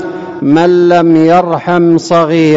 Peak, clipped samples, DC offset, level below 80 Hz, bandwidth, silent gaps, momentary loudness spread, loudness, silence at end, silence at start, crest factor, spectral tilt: 0 dBFS; under 0.1%; under 0.1%; -52 dBFS; 7.8 kHz; none; 5 LU; -8 LUFS; 0 s; 0 s; 8 dB; -7 dB/octave